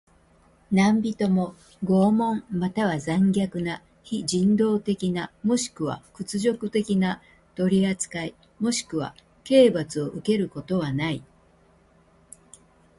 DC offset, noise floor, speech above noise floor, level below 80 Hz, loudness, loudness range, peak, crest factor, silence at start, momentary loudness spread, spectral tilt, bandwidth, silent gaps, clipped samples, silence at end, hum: under 0.1%; -58 dBFS; 35 dB; -58 dBFS; -24 LUFS; 3 LU; -4 dBFS; 20 dB; 0.7 s; 12 LU; -6 dB/octave; 11.5 kHz; none; under 0.1%; 1.75 s; none